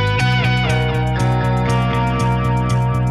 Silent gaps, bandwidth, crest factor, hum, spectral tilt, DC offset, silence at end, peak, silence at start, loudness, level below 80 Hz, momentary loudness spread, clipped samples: none; 11.5 kHz; 10 dB; none; -6.5 dB/octave; under 0.1%; 0 s; -6 dBFS; 0 s; -17 LUFS; -28 dBFS; 2 LU; under 0.1%